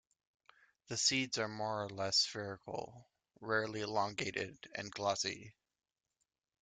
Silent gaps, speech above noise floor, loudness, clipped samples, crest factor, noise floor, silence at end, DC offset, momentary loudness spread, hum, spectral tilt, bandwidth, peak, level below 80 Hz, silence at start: none; 49 dB; -37 LUFS; under 0.1%; 22 dB; -87 dBFS; 1.1 s; under 0.1%; 14 LU; none; -2.5 dB/octave; 11.5 kHz; -18 dBFS; -76 dBFS; 0.9 s